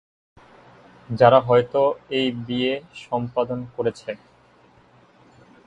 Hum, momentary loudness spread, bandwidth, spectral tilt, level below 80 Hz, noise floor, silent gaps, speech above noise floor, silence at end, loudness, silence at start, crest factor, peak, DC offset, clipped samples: none; 17 LU; 9 kHz; -7 dB/octave; -60 dBFS; -55 dBFS; none; 34 dB; 1.5 s; -21 LUFS; 1.1 s; 22 dB; 0 dBFS; under 0.1%; under 0.1%